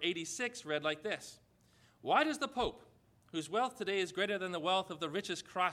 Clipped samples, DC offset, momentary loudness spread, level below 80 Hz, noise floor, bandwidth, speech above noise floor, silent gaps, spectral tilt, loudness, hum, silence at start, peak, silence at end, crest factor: under 0.1%; under 0.1%; 10 LU; -66 dBFS; -68 dBFS; 15.5 kHz; 31 dB; none; -3 dB/octave; -36 LUFS; none; 0 s; -16 dBFS; 0 s; 22 dB